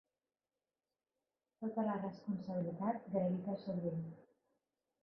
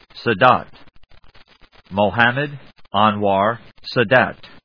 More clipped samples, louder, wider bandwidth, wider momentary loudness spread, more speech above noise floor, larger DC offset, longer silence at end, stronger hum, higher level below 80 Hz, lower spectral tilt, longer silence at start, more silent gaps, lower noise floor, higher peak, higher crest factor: neither; second, -41 LUFS vs -18 LUFS; about the same, 5.8 kHz vs 5.4 kHz; second, 7 LU vs 10 LU; first, over 50 dB vs 33 dB; second, under 0.1% vs 0.3%; first, 0.8 s vs 0.2 s; neither; second, -82 dBFS vs -54 dBFS; first, -9 dB/octave vs -7.5 dB/octave; first, 1.6 s vs 0.15 s; neither; first, under -90 dBFS vs -50 dBFS; second, -24 dBFS vs 0 dBFS; about the same, 20 dB vs 20 dB